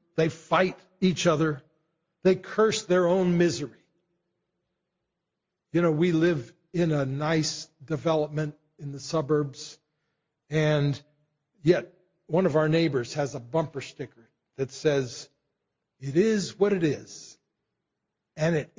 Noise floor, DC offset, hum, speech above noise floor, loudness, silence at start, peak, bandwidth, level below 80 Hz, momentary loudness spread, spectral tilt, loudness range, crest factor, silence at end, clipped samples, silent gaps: -84 dBFS; under 0.1%; none; 58 dB; -26 LUFS; 0.15 s; -8 dBFS; 7.6 kHz; -62 dBFS; 14 LU; -6 dB/octave; 4 LU; 20 dB; 0.15 s; under 0.1%; none